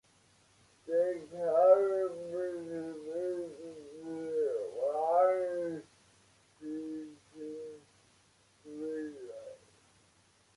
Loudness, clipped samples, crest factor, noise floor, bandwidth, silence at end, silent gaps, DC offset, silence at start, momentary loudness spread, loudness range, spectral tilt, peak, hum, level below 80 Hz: -33 LUFS; under 0.1%; 22 dB; -67 dBFS; 11.5 kHz; 1 s; none; under 0.1%; 0.85 s; 21 LU; 15 LU; -6 dB/octave; -12 dBFS; none; -78 dBFS